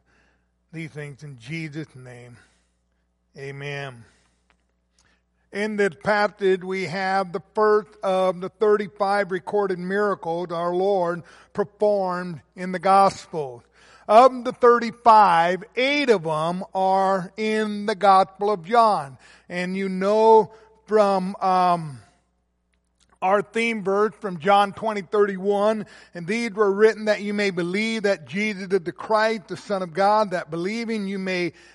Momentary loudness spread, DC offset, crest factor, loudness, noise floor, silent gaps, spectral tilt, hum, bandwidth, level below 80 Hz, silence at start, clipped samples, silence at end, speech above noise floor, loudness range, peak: 16 LU; under 0.1%; 20 dB; -21 LUFS; -70 dBFS; none; -5.5 dB/octave; none; 11.5 kHz; -66 dBFS; 0.75 s; under 0.1%; 0.25 s; 48 dB; 14 LU; -2 dBFS